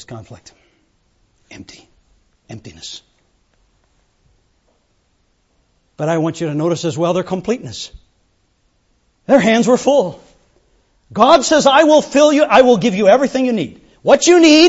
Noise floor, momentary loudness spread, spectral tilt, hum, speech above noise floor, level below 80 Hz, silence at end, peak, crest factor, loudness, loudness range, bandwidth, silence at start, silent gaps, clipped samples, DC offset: -61 dBFS; 22 LU; -4.5 dB/octave; none; 48 dB; -52 dBFS; 0 s; 0 dBFS; 16 dB; -13 LUFS; 12 LU; 8 kHz; 0.1 s; none; under 0.1%; under 0.1%